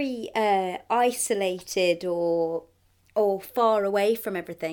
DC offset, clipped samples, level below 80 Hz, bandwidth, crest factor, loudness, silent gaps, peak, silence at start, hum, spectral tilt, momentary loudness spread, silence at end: under 0.1%; under 0.1%; -66 dBFS; 19.5 kHz; 16 dB; -25 LUFS; none; -10 dBFS; 0 s; none; -3.5 dB/octave; 7 LU; 0 s